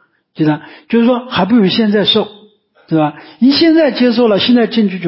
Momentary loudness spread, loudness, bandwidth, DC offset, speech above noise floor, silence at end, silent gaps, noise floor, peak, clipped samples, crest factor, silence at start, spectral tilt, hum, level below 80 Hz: 7 LU; -12 LUFS; 5.8 kHz; under 0.1%; 35 dB; 0 s; none; -46 dBFS; 0 dBFS; under 0.1%; 12 dB; 0.4 s; -10 dB/octave; none; -54 dBFS